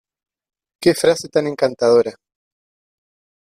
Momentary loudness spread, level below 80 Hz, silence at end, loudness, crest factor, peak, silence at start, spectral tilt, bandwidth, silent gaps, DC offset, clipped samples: 6 LU; -60 dBFS; 1.45 s; -17 LUFS; 18 dB; -2 dBFS; 0.8 s; -4.5 dB/octave; 14.5 kHz; none; under 0.1%; under 0.1%